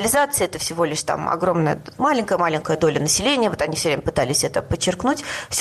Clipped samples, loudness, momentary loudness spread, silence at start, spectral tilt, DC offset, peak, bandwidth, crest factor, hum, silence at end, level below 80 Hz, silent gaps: under 0.1%; -20 LUFS; 5 LU; 0 s; -3.5 dB/octave; under 0.1%; -6 dBFS; 13 kHz; 14 dB; none; 0 s; -46 dBFS; none